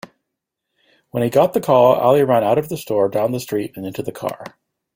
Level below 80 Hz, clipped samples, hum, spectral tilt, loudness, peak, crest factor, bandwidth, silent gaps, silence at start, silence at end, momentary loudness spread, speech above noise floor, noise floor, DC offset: -58 dBFS; under 0.1%; none; -6.5 dB/octave; -18 LUFS; -2 dBFS; 18 dB; 16.5 kHz; none; 1.15 s; 0.5 s; 14 LU; 62 dB; -79 dBFS; under 0.1%